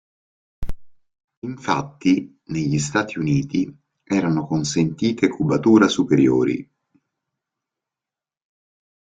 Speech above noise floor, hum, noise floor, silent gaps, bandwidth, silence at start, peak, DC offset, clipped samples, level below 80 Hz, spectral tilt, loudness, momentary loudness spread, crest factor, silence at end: 70 dB; none; -90 dBFS; 1.24-1.28 s, 1.37-1.42 s; 9.4 kHz; 0.6 s; -2 dBFS; under 0.1%; under 0.1%; -46 dBFS; -6 dB/octave; -20 LUFS; 15 LU; 20 dB; 2.45 s